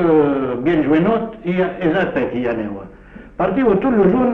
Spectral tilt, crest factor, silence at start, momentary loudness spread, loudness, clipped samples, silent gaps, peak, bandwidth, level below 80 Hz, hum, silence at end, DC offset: -9.5 dB/octave; 14 dB; 0 s; 8 LU; -17 LUFS; under 0.1%; none; -4 dBFS; 4.4 kHz; -42 dBFS; none; 0 s; under 0.1%